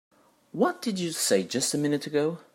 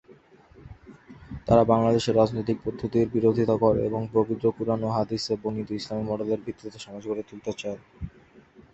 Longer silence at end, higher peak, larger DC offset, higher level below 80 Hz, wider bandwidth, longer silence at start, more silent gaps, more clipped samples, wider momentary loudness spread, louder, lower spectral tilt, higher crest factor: about the same, 0.15 s vs 0.15 s; second, -10 dBFS vs -4 dBFS; neither; second, -74 dBFS vs -50 dBFS; first, 16 kHz vs 8.2 kHz; first, 0.55 s vs 0.1 s; neither; neither; second, 5 LU vs 17 LU; about the same, -27 LUFS vs -25 LUFS; second, -3.5 dB/octave vs -7 dB/octave; about the same, 18 dB vs 22 dB